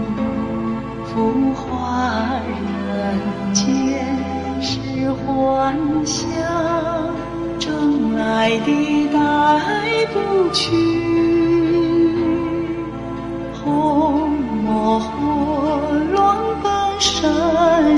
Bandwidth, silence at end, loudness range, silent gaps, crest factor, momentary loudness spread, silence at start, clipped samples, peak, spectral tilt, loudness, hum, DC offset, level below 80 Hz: 11 kHz; 0 s; 4 LU; none; 14 dB; 8 LU; 0 s; under 0.1%; -2 dBFS; -5 dB/octave; -18 LUFS; none; under 0.1%; -42 dBFS